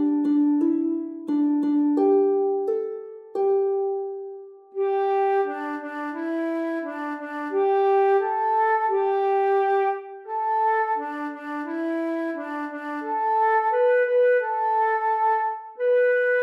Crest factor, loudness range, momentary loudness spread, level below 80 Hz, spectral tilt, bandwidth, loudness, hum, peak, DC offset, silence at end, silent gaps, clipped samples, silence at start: 12 dB; 4 LU; 11 LU; under -90 dBFS; -6 dB/octave; 5.4 kHz; -23 LUFS; none; -10 dBFS; under 0.1%; 0 s; none; under 0.1%; 0 s